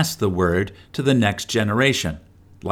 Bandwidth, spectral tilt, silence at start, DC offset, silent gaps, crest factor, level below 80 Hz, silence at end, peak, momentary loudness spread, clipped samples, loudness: 19 kHz; -5 dB/octave; 0 s; under 0.1%; none; 18 dB; -44 dBFS; 0 s; -4 dBFS; 11 LU; under 0.1%; -20 LUFS